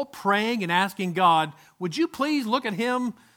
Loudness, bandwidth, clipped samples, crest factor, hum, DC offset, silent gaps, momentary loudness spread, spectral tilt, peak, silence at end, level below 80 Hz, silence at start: -24 LUFS; 18.5 kHz; under 0.1%; 20 dB; none; under 0.1%; none; 8 LU; -5 dB/octave; -6 dBFS; 0.25 s; -70 dBFS; 0 s